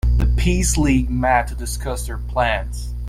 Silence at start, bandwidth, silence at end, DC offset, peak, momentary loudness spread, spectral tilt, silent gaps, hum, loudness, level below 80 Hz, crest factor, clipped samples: 0.05 s; 15 kHz; 0 s; under 0.1%; -4 dBFS; 9 LU; -5 dB/octave; none; none; -20 LUFS; -22 dBFS; 16 dB; under 0.1%